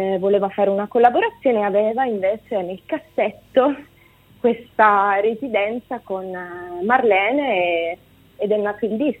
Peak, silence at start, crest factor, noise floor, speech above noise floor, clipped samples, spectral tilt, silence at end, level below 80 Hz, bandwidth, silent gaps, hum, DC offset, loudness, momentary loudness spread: -2 dBFS; 0 s; 18 dB; -51 dBFS; 32 dB; under 0.1%; -7.5 dB/octave; 0.05 s; -60 dBFS; 16 kHz; none; none; under 0.1%; -20 LUFS; 12 LU